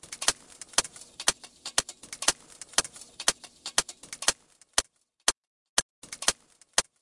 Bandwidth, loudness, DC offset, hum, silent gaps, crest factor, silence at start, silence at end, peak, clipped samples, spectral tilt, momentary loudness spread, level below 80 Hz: 11.5 kHz; -28 LUFS; under 0.1%; none; 5.37-6.02 s; 28 dB; 0.1 s; 0.2 s; -4 dBFS; under 0.1%; 1 dB/octave; 13 LU; -60 dBFS